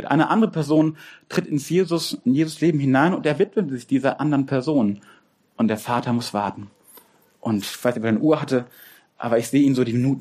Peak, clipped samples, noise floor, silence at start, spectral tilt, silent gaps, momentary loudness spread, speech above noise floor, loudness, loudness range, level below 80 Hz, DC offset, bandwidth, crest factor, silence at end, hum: -4 dBFS; under 0.1%; -52 dBFS; 0 s; -6.5 dB/octave; none; 8 LU; 32 dB; -21 LUFS; 4 LU; -64 dBFS; under 0.1%; 15.5 kHz; 18 dB; 0 s; none